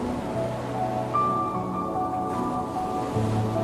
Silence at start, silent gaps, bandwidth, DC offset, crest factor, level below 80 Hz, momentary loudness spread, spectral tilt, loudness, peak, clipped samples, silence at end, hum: 0 s; none; 14 kHz; under 0.1%; 14 dB; -48 dBFS; 5 LU; -7.5 dB/octave; -27 LUFS; -14 dBFS; under 0.1%; 0 s; none